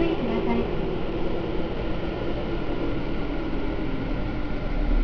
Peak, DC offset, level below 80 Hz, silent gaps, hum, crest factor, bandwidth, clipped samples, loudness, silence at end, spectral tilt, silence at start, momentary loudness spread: -10 dBFS; under 0.1%; -30 dBFS; none; none; 14 dB; 5.4 kHz; under 0.1%; -29 LUFS; 0 s; -8.5 dB/octave; 0 s; 5 LU